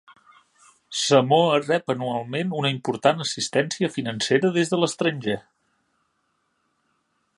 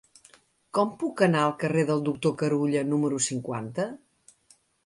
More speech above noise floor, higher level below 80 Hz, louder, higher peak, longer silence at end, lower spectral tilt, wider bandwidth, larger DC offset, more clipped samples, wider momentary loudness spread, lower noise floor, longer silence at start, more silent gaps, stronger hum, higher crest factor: first, 49 dB vs 37 dB; about the same, -68 dBFS vs -68 dBFS; first, -23 LUFS vs -26 LUFS; first, -2 dBFS vs -10 dBFS; first, 2 s vs 0.9 s; about the same, -4.5 dB/octave vs -5.5 dB/octave; about the same, 11.5 kHz vs 11.5 kHz; neither; neither; about the same, 8 LU vs 9 LU; first, -72 dBFS vs -63 dBFS; first, 0.9 s vs 0.75 s; neither; neither; about the same, 22 dB vs 18 dB